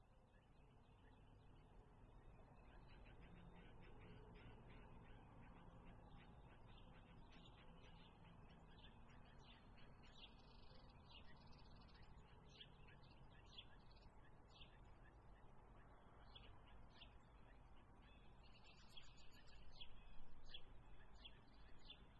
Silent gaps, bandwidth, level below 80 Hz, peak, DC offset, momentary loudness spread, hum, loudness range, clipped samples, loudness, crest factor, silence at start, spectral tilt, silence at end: none; 7 kHz; -68 dBFS; -42 dBFS; under 0.1%; 6 LU; none; 2 LU; under 0.1%; -66 LUFS; 20 dB; 0 s; -3.5 dB/octave; 0 s